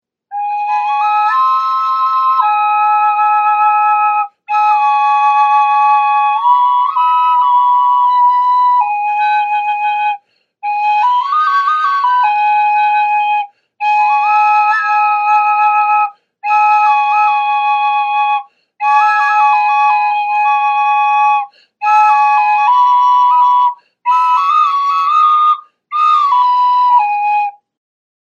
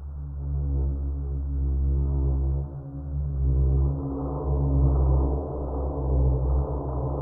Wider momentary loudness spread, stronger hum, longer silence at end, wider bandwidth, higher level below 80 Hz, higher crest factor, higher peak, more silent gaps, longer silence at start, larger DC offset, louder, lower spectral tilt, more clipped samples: about the same, 7 LU vs 8 LU; neither; first, 0.8 s vs 0 s; first, 7 kHz vs 1.5 kHz; second, under -90 dBFS vs -26 dBFS; about the same, 12 dB vs 14 dB; first, 0 dBFS vs -12 dBFS; neither; first, 0.3 s vs 0 s; neither; first, -11 LUFS vs -27 LUFS; second, 3 dB/octave vs -15.5 dB/octave; neither